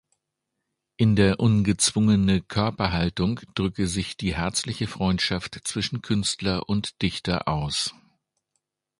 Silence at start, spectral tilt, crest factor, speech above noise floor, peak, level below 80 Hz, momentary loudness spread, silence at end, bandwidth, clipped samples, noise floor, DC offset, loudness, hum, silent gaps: 1 s; -5 dB/octave; 20 dB; 58 dB; -6 dBFS; -44 dBFS; 8 LU; 1.1 s; 11.5 kHz; under 0.1%; -82 dBFS; under 0.1%; -24 LUFS; none; none